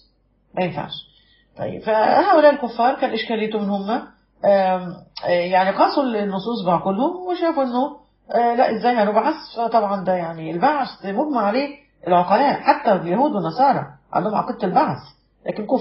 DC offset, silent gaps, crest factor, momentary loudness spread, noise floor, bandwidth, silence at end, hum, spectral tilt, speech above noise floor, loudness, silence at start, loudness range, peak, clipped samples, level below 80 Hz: under 0.1%; none; 18 dB; 11 LU; -61 dBFS; 5.8 kHz; 0 s; none; -4.5 dB/octave; 42 dB; -20 LUFS; 0.55 s; 2 LU; -2 dBFS; under 0.1%; -60 dBFS